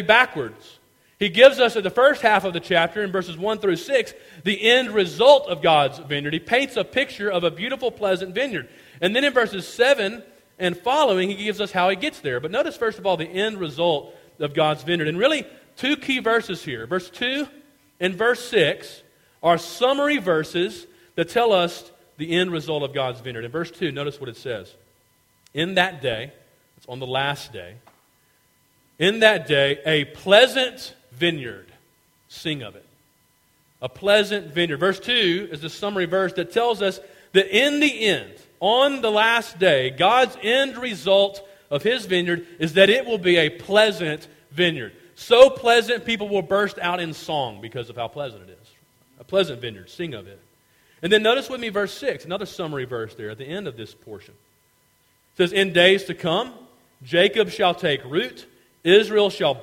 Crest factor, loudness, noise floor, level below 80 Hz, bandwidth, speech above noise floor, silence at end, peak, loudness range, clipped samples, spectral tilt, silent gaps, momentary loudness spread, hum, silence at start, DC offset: 22 dB; -21 LUFS; -62 dBFS; -60 dBFS; 16.5 kHz; 41 dB; 0 s; 0 dBFS; 8 LU; under 0.1%; -4.5 dB/octave; none; 16 LU; none; 0 s; under 0.1%